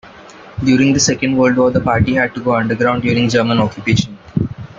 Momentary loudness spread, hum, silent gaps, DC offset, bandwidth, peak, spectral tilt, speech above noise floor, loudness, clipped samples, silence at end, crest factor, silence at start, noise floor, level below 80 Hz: 9 LU; none; none; under 0.1%; 7.6 kHz; -2 dBFS; -5 dB/octave; 24 dB; -15 LUFS; under 0.1%; 0.05 s; 14 dB; 0.05 s; -38 dBFS; -42 dBFS